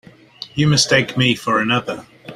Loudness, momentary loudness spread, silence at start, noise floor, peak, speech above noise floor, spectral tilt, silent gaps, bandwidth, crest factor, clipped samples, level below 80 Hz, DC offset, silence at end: -16 LUFS; 16 LU; 0.4 s; -38 dBFS; -2 dBFS; 22 dB; -4 dB/octave; none; 15 kHz; 18 dB; under 0.1%; -52 dBFS; under 0.1%; 0 s